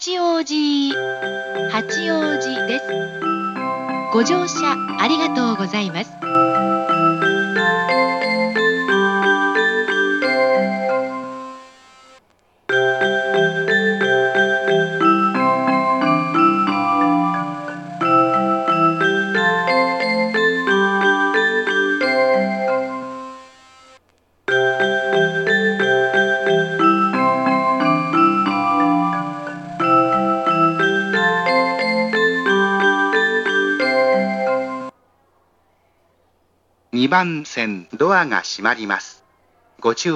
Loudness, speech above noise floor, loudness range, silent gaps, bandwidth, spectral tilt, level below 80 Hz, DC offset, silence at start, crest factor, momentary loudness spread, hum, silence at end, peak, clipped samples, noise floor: -17 LUFS; 43 dB; 4 LU; none; 8.8 kHz; -4.5 dB/octave; -70 dBFS; under 0.1%; 0 s; 18 dB; 8 LU; none; 0 s; 0 dBFS; under 0.1%; -62 dBFS